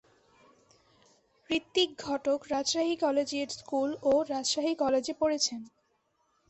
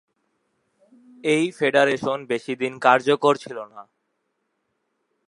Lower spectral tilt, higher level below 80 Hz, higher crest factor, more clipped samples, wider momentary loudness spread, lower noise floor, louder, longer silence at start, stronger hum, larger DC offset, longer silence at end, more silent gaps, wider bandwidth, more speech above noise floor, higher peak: second, -2 dB/octave vs -4.5 dB/octave; about the same, -68 dBFS vs -72 dBFS; about the same, 18 dB vs 22 dB; neither; second, 6 LU vs 13 LU; about the same, -74 dBFS vs -74 dBFS; second, -30 LUFS vs -21 LUFS; first, 1.5 s vs 1.25 s; neither; neither; second, 0.8 s vs 1.45 s; neither; second, 8.4 kHz vs 11 kHz; second, 44 dB vs 53 dB; second, -14 dBFS vs -2 dBFS